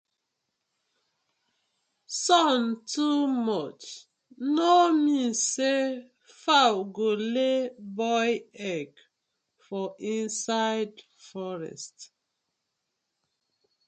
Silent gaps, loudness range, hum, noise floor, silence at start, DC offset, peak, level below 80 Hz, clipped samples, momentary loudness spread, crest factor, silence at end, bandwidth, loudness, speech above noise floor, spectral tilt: none; 8 LU; none; -82 dBFS; 2.1 s; under 0.1%; -8 dBFS; -82 dBFS; under 0.1%; 17 LU; 22 dB; 1.85 s; 9.4 kHz; -26 LUFS; 56 dB; -3 dB/octave